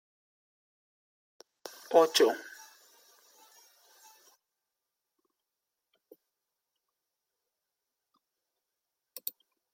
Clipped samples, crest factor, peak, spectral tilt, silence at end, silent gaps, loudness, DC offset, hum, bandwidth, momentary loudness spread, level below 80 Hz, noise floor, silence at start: under 0.1%; 28 dB; -10 dBFS; -1.5 dB/octave; 7.25 s; none; -28 LUFS; under 0.1%; none; 16.5 kHz; 25 LU; under -90 dBFS; -88 dBFS; 1.9 s